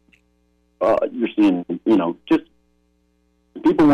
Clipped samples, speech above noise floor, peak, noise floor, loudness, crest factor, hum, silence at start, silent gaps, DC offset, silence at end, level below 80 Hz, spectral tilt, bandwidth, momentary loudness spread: under 0.1%; 46 dB; -8 dBFS; -63 dBFS; -20 LUFS; 12 dB; 60 Hz at -50 dBFS; 0.8 s; none; under 0.1%; 0 s; -54 dBFS; -8 dB/octave; 6.4 kHz; 5 LU